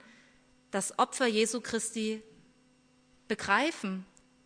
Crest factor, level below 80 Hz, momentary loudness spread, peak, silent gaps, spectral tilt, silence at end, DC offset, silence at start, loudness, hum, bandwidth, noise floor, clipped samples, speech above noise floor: 22 dB; -72 dBFS; 11 LU; -12 dBFS; none; -3 dB/octave; 0.4 s; under 0.1%; 0.75 s; -31 LUFS; none; 11 kHz; -65 dBFS; under 0.1%; 34 dB